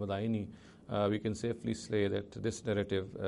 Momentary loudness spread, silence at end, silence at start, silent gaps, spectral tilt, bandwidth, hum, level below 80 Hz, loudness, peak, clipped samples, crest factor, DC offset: 6 LU; 0 s; 0 s; none; -6 dB/octave; 11.5 kHz; none; -62 dBFS; -35 LUFS; -20 dBFS; under 0.1%; 16 dB; under 0.1%